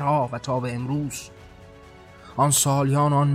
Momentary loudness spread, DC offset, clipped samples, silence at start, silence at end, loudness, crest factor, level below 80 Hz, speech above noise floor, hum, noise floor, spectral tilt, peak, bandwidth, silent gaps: 15 LU; under 0.1%; under 0.1%; 0 s; 0 s; -22 LUFS; 16 dB; -54 dBFS; 24 dB; none; -46 dBFS; -5 dB/octave; -6 dBFS; 16 kHz; none